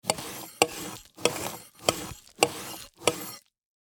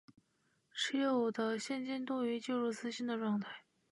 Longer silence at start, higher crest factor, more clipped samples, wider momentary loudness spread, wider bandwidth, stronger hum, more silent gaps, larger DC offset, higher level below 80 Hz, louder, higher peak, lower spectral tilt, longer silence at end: second, 0.05 s vs 0.75 s; first, 30 dB vs 16 dB; neither; first, 13 LU vs 7 LU; first, over 20 kHz vs 11.5 kHz; neither; neither; neither; first, -62 dBFS vs -90 dBFS; first, -30 LUFS vs -37 LUFS; first, -2 dBFS vs -22 dBFS; second, -2 dB/octave vs -4.5 dB/octave; first, 0.55 s vs 0.3 s